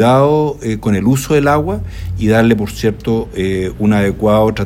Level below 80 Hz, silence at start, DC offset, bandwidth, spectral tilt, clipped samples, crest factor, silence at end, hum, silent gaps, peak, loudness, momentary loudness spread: -32 dBFS; 0 s; under 0.1%; 16.5 kHz; -7 dB/octave; under 0.1%; 14 dB; 0 s; none; none; 0 dBFS; -14 LUFS; 7 LU